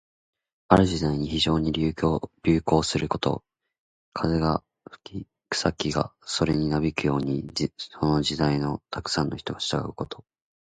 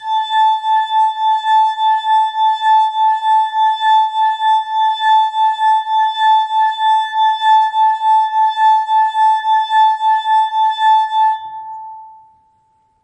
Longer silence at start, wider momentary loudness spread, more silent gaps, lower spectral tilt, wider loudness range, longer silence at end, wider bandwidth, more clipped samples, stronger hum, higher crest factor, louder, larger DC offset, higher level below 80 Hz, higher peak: first, 0.7 s vs 0 s; first, 12 LU vs 3 LU; first, 3.79-4.12 s vs none; first, -5.5 dB/octave vs 3 dB/octave; first, 4 LU vs 1 LU; second, 0.45 s vs 0.9 s; about the same, 9.4 kHz vs 9.2 kHz; neither; neither; first, 24 dB vs 10 dB; second, -25 LUFS vs -13 LUFS; neither; first, -44 dBFS vs -74 dBFS; about the same, -2 dBFS vs -4 dBFS